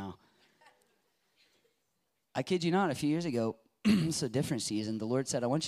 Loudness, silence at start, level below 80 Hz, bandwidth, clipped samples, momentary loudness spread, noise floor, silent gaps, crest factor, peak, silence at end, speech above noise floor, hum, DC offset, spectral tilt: -32 LUFS; 0 s; -68 dBFS; 15.5 kHz; under 0.1%; 8 LU; -81 dBFS; none; 18 dB; -16 dBFS; 0 s; 50 dB; none; under 0.1%; -5 dB/octave